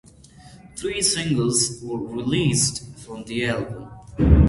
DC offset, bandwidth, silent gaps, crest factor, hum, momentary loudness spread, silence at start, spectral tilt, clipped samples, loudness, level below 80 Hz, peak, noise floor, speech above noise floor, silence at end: under 0.1%; 11.5 kHz; none; 22 dB; none; 18 LU; 0.4 s; -4.5 dB/octave; under 0.1%; -22 LUFS; -28 dBFS; 0 dBFS; -47 dBFS; 26 dB; 0 s